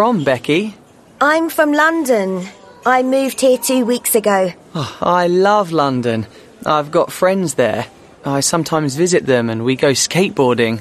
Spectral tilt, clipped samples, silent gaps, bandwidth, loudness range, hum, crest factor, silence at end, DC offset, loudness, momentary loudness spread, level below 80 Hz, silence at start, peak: -4.5 dB/octave; under 0.1%; none; 13.5 kHz; 2 LU; none; 14 dB; 0 s; under 0.1%; -15 LUFS; 10 LU; -56 dBFS; 0 s; 0 dBFS